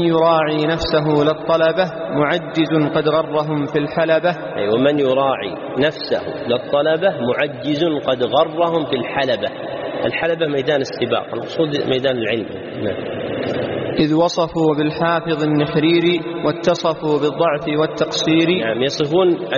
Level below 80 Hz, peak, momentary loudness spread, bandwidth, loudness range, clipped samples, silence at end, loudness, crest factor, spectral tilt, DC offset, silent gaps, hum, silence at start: -50 dBFS; -2 dBFS; 7 LU; 7.2 kHz; 3 LU; under 0.1%; 0 s; -18 LUFS; 14 dB; -4 dB/octave; under 0.1%; none; none; 0 s